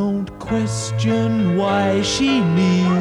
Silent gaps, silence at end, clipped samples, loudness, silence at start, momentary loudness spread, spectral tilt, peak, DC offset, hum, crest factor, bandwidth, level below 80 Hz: none; 0 s; under 0.1%; -18 LUFS; 0 s; 6 LU; -5.5 dB/octave; -6 dBFS; under 0.1%; none; 12 dB; 11.5 kHz; -44 dBFS